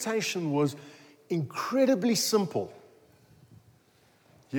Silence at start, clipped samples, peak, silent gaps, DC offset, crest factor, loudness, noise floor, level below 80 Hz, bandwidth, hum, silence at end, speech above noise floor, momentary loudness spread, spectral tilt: 0 s; under 0.1%; -14 dBFS; none; under 0.1%; 16 dB; -28 LUFS; -63 dBFS; -80 dBFS; over 20 kHz; none; 0 s; 36 dB; 10 LU; -4.5 dB/octave